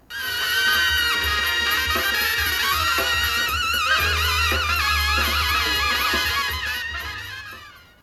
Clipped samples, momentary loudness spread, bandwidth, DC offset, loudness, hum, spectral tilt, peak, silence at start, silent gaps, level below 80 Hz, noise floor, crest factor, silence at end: under 0.1%; 9 LU; 15.5 kHz; under 0.1%; -20 LUFS; none; -1.5 dB/octave; -8 dBFS; 0.1 s; none; -34 dBFS; -43 dBFS; 14 dB; 0.25 s